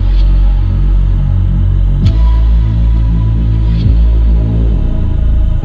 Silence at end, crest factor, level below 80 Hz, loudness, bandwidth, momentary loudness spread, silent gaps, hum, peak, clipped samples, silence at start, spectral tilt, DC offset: 0 s; 8 dB; -10 dBFS; -12 LUFS; 4.7 kHz; 3 LU; none; none; 0 dBFS; under 0.1%; 0 s; -9.5 dB/octave; under 0.1%